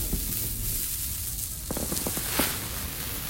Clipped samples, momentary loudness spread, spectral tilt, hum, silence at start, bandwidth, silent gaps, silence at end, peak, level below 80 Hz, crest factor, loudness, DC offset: under 0.1%; 6 LU; -2.5 dB/octave; none; 0 s; 16.5 kHz; none; 0 s; -8 dBFS; -38 dBFS; 22 dB; -28 LUFS; under 0.1%